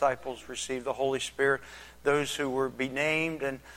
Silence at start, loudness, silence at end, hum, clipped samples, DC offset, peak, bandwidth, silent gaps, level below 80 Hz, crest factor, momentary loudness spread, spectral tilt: 0 s; -30 LUFS; 0 s; none; under 0.1%; under 0.1%; -12 dBFS; 16 kHz; none; -60 dBFS; 18 dB; 9 LU; -3.5 dB/octave